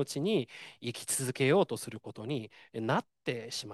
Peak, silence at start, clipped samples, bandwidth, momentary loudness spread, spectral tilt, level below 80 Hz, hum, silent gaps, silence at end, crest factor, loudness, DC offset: -14 dBFS; 0 s; under 0.1%; 12.5 kHz; 15 LU; -4.5 dB/octave; -76 dBFS; none; none; 0 s; 18 dB; -33 LUFS; under 0.1%